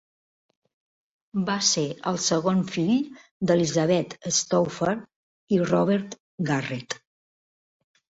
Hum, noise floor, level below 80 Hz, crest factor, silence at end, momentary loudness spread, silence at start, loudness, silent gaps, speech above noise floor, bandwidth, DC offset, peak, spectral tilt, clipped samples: none; under -90 dBFS; -64 dBFS; 18 dB; 1.25 s; 11 LU; 1.35 s; -25 LUFS; 3.31-3.40 s, 5.16-5.48 s, 6.20-6.38 s; over 66 dB; 8 kHz; under 0.1%; -8 dBFS; -4.5 dB/octave; under 0.1%